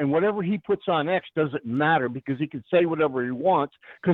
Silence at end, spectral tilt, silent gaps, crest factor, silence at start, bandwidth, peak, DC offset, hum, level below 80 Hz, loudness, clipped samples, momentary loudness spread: 0 s; -9.5 dB/octave; none; 16 dB; 0 s; 4.4 kHz; -8 dBFS; under 0.1%; none; -66 dBFS; -25 LUFS; under 0.1%; 7 LU